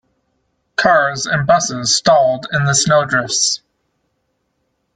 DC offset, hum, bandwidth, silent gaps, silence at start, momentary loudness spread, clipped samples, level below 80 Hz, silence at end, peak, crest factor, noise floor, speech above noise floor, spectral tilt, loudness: under 0.1%; none; 10 kHz; none; 0.8 s; 5 LU; under 0.1%; -52 dBFS; 1.4 s; -2 dBFS; 16 dB; -68 dBFS; 54 dB; -3 dB/octave; -14 LUFS